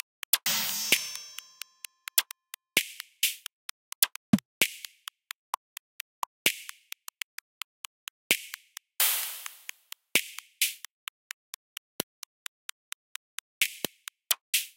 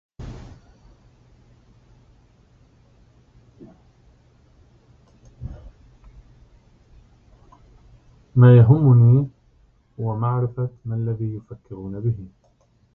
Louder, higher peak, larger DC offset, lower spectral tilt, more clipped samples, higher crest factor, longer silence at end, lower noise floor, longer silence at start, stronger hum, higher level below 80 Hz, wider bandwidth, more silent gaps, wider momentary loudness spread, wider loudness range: second, -29 LUFS vs -18 LUFS; about the same, -4 dBFS vs -2 dBFS; neither; second, -1 dB/octave vs -11.5 dB/octave; neither; first, 30 dB vs 20 dB; second, 0.1 s vs 0.7 s; second, -49 dBFS vs -60 dBFS; first, 0.35 s vs 0.2 s; neither; second, -76 dBFS vs -48 dBFS; first, 17 kHz vs 3.7 kHz; first, 3.53-4.02 s, 4.16-4.33 s, 4.45-4.61 s, 5.35-6.45 s, 7.23-8.30 s, 10.91-13.61 s, 14.41-14.53 s vs none; second, 19 LU vs 26 LU; second, 7 LU vs 10 LU